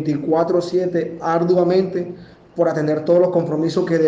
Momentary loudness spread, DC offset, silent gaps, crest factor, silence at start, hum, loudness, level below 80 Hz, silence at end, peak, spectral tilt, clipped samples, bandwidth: 9 LU; under 0.1%; none; 14 dB; 0 s; none; -18 LUFS; -58 dBFS; 0 s; -4 dBFS; -8 dB/octave; under 0.1%; 7.8 kHz